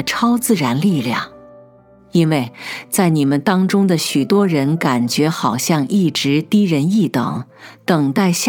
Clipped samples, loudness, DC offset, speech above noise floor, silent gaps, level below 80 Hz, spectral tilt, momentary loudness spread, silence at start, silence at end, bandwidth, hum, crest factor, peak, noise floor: under 0.1%; -16 LUFS; under 0.1%; 31 dB; none; -62 dBFS; -5.5 dB/octave; 8 LU; 0 s; 0 s; 19 kHz; none; 16 dB; 0 dBFS; -47 dBFS